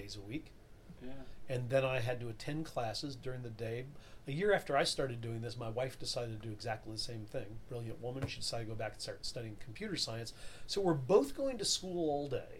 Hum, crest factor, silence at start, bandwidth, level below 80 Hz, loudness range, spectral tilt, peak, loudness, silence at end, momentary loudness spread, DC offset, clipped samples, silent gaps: none; 22 dB; 0 s; 16 kHz; -56 dBFS; 6 LU; -4.5 dB/octave; -16 dBFS; -38 LUFS; 0 s; 14 LU; under 0.1%; under 0.1%; none